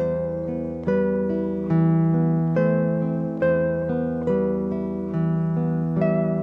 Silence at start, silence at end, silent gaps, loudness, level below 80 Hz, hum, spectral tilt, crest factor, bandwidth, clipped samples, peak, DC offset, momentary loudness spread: 0 s; 0 s; none; -23 LUFS; -48 dBFS; none; -11.5 dB/octave; 14 dB; 3.3 kHz; under 0.1%; -8 dBFS; under 0.1%; 6 LU